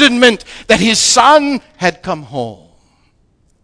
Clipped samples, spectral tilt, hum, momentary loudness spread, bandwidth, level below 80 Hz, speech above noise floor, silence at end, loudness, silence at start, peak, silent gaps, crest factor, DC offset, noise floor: 0.4%; -2.5 dB/octave; none; 16 LU; 11 kHz; -44 dBFS; 43 dB; 1.1 s; -11 LUFS; 0 s; 0 dBFS; none; 14 dB; under 0.1%; -55 dBFS